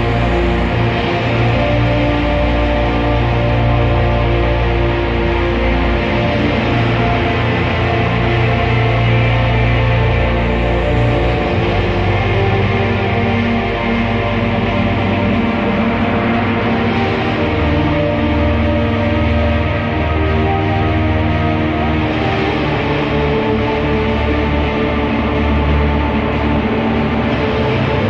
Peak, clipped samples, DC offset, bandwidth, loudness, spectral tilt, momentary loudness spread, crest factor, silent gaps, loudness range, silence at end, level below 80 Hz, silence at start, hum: -2 dBFS; under 0.1%; under 0.1%; 7 kHz; -15 LUFS; -8 dB/octave; 2 LU; 12 dB; none; 1 LU; 0 s; -22 dBFS; 0 s; none